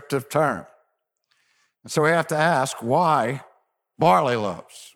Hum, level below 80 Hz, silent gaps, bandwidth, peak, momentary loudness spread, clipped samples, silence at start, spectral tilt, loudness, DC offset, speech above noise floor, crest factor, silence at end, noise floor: none; -68 dBFS; none; 17 kHz; -6 dBFS; 11 LU; under 0.1%; 0.1 s; -5 dB/octave; -21 LUFS; under 0.1%; 52 dB; 18 dB; 0.1 s; -73 dBFS